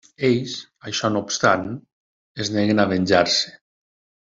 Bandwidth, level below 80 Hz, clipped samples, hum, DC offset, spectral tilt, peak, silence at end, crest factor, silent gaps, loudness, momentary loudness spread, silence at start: 7.8 kHz; -60 dBFS; under 0.1%; none; under 0.1%; -4 dB/octave; -2 dBFS; 0.7 s; 20 dB; 1.92-2.35 s; -21 LUFS; 15 LU; 0.2 s